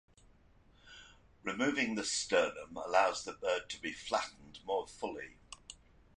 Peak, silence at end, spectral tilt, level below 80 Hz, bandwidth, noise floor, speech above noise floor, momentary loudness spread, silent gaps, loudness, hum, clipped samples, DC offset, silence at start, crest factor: -14 dBFS; 0.45 s; -2.5 dB/octave; -66 dBFS; 11 kHz; -64 dBFS; 29 dB; 23 LU; none; -35 LUFS; none; under 0.1%; under 0.1%; 0.85 s; 22 dB